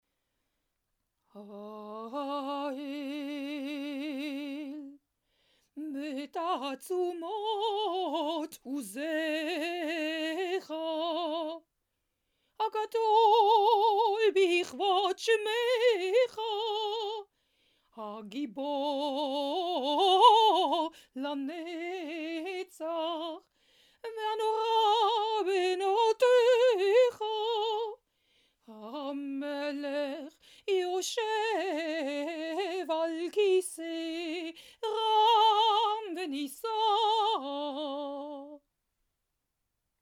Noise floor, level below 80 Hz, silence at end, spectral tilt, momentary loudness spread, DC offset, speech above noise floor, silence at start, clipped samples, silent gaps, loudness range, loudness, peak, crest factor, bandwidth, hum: -83 dBFS; -84 dBFS; 1.45 s; -2 dB/octave; 15 LU; under 0.1%; 52 dB; 1.35 s; under 0.1%; none; 11 LU; -30 LUFS; -8 dBFS; 22 dB; 16.5 kHz; none